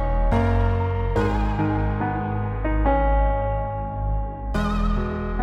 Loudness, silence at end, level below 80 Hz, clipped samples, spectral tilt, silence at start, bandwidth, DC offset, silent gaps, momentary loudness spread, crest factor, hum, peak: -24 LUFS; 0 s; -24 dBFS; under 0.1%; -8.5 dB/octave; 0 s; 6.6 kHz; under 0.1%; none; 6 LU; 14 dB; none; -8 dBFS